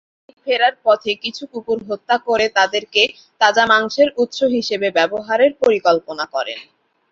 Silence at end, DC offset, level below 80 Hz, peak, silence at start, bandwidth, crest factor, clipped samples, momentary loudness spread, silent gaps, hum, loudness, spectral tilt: 0.5 s; under 0.1%; -62 dBFS; -2 dBFS; 0.45 s; 7.8 kHz; 16 dB; under 0.1%; 10 LU; none; none; -17 LUFS; -2.5 dB/octave